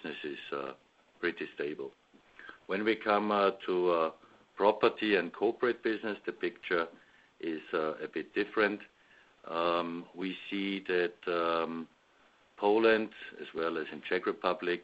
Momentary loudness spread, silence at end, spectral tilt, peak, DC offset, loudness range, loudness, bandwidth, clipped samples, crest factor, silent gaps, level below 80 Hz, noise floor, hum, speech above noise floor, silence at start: 14 LU; 0 s; -2.5 dB/octave; -12 dBFS; under 0.1%; 5 LU; -32 LUFS; 7.8 kHz; under 0.1%; 22 dB; none; -74 dBFS; -66 dBFS; none; 34 dB; 0 s